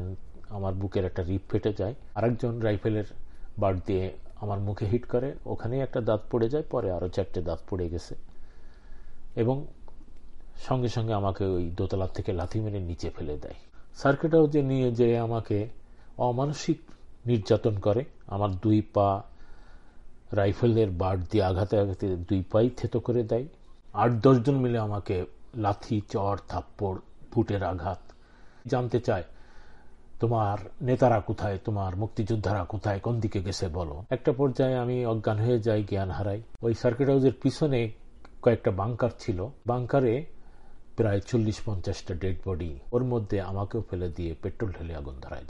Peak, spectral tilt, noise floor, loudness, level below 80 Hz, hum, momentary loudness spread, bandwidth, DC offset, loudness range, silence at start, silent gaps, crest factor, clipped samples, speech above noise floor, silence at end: -8 dBFS; -8 dB/octave; -50 dBFS; -28 LUFS; -46 dBFS; none; 11 LU; 10.5 kHz; under 0.1%; 5 LU; 0 s; none; 20 dB; under 0.1%; 23 dB; 0 s